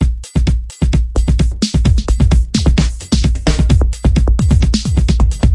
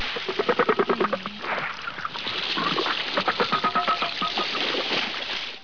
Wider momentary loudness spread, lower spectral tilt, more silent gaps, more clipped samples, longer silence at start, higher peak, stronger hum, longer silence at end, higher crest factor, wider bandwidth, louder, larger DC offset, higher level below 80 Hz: second, 3 LU vs 7 LU; first, -6 dB/octave vs -3.5 dB/octave; neither; neither; about the same, 0 s vs 0 s; first, 0 dBFS vs -8 dBFS; neither; about the same, 0 s vs 0 s; second, 12 dB vs 18 dB; first, 11.5 kHz vs 5.4 kHz; first, -14 LUFS vs -25 LUFS; second, under 0.1% vs 0.5%; first, -14 dBFS vs -60 dBFS